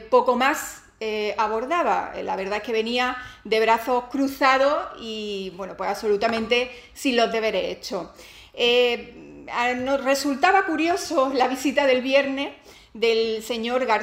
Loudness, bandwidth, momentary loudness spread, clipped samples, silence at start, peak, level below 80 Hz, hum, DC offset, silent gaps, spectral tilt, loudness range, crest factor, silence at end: -23 LUFS; 16 kHz; 13 LU; under 0.1%; 0 s; -4 dBFS; -56 dBFS; none; under 0.1%; none; -3 dB/octave; 3 LU; 18 dB; 0 s